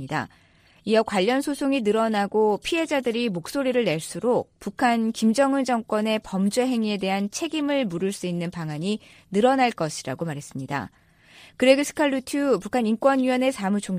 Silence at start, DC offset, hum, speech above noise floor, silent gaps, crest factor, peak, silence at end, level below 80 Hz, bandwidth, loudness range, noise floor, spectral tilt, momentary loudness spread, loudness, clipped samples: 0 s; under 0.1%; none; 28 dB; none; 20 dB; -2 dBFS; 0 s; -60 dBFS; 15.5 kHz; 3 LU; -51 dBFS; -5 dB/octave; 10 LU; -24 LUFS; under 0.1%